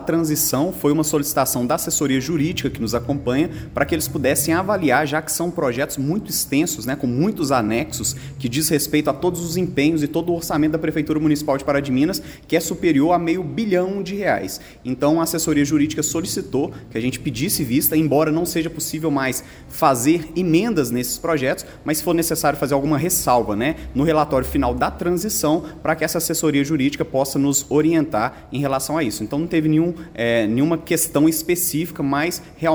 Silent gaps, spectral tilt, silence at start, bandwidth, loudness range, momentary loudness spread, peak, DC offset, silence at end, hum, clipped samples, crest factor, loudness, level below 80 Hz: none; -4.5 dB/octave; 0 s; over 20 kHz; 1 LU; 6 LU; -2 dBFS; under 0.1%; 0 s; none; under 0.1%; 18 dB; -20 LUFS; -42 dBFS